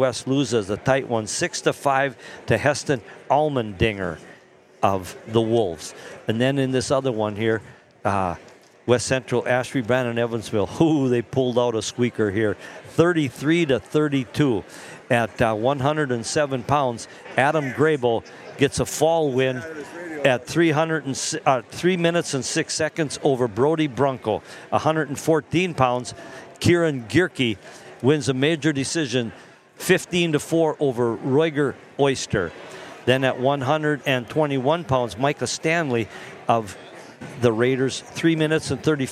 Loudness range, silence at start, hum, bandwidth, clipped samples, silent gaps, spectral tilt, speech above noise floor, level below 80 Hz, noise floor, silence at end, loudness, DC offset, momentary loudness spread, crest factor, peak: 2 LU; 0 s; none; 15 kHz; under 0.1%; none; -5 dB/octave; 29 dB; -54 dBFS; -50 dBFS; 0 s; -22 LUFS; under 0.1%; 9 LU; 20 dB; -2 dBFS